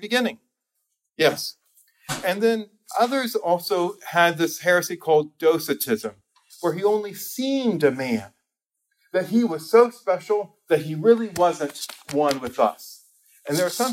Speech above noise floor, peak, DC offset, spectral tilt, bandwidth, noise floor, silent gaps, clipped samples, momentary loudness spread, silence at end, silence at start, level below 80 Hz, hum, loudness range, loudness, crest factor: 59 dB; -4 dBFS; under 0.1%; -4 dB/octave; 16.5 kHz; -81 dBFS; none; under 0.1%; 10 LU; 0 s; 0 s; -68 dBFS; none; 4 LU; -23 LUFS; 20 dB